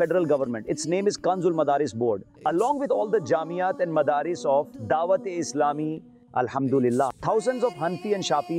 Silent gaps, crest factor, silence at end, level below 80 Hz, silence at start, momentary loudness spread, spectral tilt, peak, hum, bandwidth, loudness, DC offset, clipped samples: none; 14 dB; 0 s; -64 dBFS; 0 s; 6 LU; -5.5 dB/octave; -12 dBFS; none; 13 kHz; -25 LUFS; under 0.1%; under 0.1%